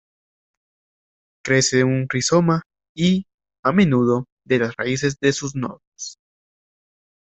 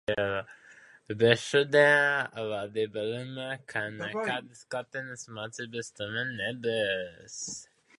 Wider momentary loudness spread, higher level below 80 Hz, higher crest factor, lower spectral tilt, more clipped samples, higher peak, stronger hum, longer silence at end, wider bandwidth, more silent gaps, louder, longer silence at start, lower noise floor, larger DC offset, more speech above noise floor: about the same, 17 LU vs 16 LU; first, -56 dBFS vs -66 dBFS; second, 18 dB vs 26 dB; about the same, -5 dB/octave vs -4 dB/octave; neither; about the same, -4 dBFS vs -4 dBFS; neither; first, 1.15 s vs 0.35 s; second, 8.4 kHz vs 11.5 kHz; first, 2.66-2.70 s, 2.89-2.95 s, 3.34-3.38 s, 3.59-3.63 s, 4.32-4.37 s, 5.87-5.92 s vs none; first, -20 LUFS vs -29 LUFS; first, 1.45 s vs 0.1 s; first, under -90 dBFS vs -55 dBFS; neither; first, over 71 dB vs 26 dB